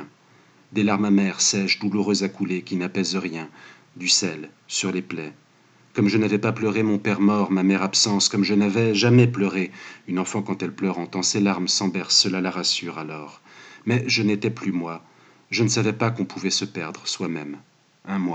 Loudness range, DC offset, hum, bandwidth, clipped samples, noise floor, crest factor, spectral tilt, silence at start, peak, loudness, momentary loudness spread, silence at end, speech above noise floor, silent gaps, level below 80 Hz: 6 LU; under 0.1%; none; 9.2 kHz; under 0.1%; -56 dBFS; 20 dB; -4 dB/octave; 0 s; -4 dBFS; -22 LUFS; 14 LU; 0 s; 34 dB; none; -80 dBFS